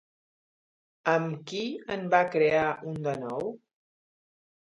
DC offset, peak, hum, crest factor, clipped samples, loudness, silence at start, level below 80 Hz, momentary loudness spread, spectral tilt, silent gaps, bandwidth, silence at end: under 0.1%; -8 dBFS; none; 24 dB; under 0.1%; -28 LUFS; 1.05 s; -68 dBFS; 10 LU; -6 dB/octave; none; 7.8 kHz; 1.2 s